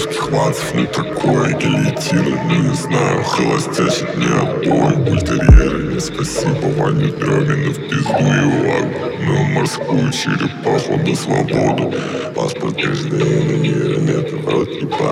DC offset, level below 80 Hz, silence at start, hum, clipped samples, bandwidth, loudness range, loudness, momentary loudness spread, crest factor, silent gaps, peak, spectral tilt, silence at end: under 0.1%; -26 dBFS; 0 s; none; under 0.1%; 13.5 kHz; 3 LU; -16 LUFS; 5 LU; 16 dB; none; 0 dBFS; -6 dB/octave; 0 s